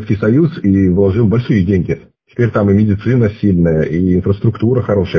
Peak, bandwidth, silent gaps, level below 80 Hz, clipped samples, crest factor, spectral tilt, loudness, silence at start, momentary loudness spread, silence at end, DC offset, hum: -2 dBFS; 6.4 kHz; none; -30 dBFS; under 0.1%; 10 dB; -10 dB/octave; -13 LUFS; 0 s; 4 LU; 0 s; under 0.1%; none